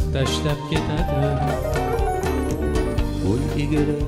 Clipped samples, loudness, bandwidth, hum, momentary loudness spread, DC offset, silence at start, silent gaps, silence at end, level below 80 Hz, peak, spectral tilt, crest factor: under 0.1%; -23 LUFS; 16 kHz; none; 2 LU; under 0.1%; 0 s; none; 0 s; -28 dBFS; -6 dBFS; -6.5 dB/octave; 14 dB